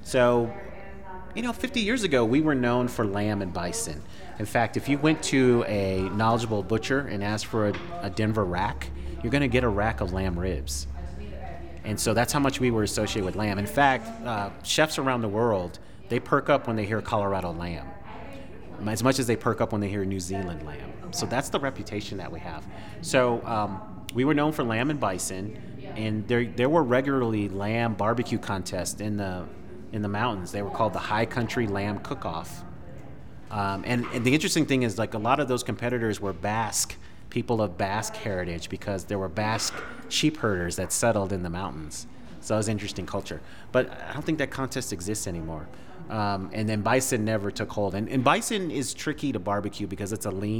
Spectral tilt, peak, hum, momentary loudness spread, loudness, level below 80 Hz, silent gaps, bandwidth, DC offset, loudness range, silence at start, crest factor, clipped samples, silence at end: -5 dB/octave; -6 dBFS; none; 15 LU; -27 LUFS; -46 dBFS; none; 18 kHz; 0.8%; 4 LU; 0 s; 22 dB; under 0.1%; 0 s